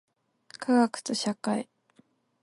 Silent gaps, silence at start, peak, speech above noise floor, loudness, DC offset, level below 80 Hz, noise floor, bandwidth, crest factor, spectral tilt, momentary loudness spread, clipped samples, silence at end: none; 0.6 s; -12 dBFS; 38 dB; -28 LUFS; under 0.1%; -78 dBFS; -65 dBFS; 11.5 kHz; 18 dB; -4 dB/octave; 12 LU; under 0.1%; 0.8 s